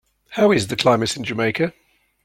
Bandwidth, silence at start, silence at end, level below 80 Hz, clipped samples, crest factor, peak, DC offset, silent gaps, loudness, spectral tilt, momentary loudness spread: 16.5 kHz; 0.3 s; 0.55 s; -54 dBFS; under 0.1%; 18 dB; -2 dBFS; under 0.1%; none; -19 LUFS; -4.5 dB/octave; 7 LU